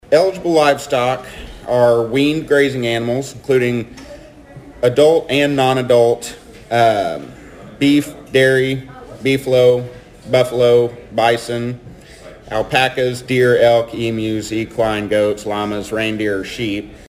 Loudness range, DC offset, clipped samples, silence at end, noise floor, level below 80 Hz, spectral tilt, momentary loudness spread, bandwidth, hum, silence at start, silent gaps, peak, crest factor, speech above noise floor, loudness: 2 LU; under 0.1%; under 0.1%; 0.1 s; -38 dBFS; -46 dBFS; -5.5 dB/octave; 11 LU; 15.5 kHz; none; 0.1 s; none; 0 dBFS; 16 dB; 23 dB; -16 LUFS